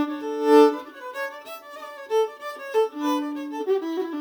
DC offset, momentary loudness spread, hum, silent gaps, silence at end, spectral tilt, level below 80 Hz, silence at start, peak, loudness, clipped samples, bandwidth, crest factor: under 0.1%; 21 LU; none; none; 0 s; -3 dB/octave; -82 dBFS; 0 s; -4 dBFS; -23 LUFS; under 0.1%; over 20 kHz; 20 dB